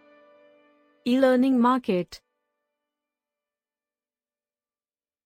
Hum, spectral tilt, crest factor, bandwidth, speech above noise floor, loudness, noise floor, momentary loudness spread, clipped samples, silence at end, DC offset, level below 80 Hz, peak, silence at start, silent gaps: none; -6.5 dB/octave; 20 dB; 13.5 kHz; over 68 dB; -23 LUFS; under -90 dBFS; 12 LU; under 0.1%; 3.1 s; under 0.1%; -70 dBFS; -8 dBFS; 1.05 s; none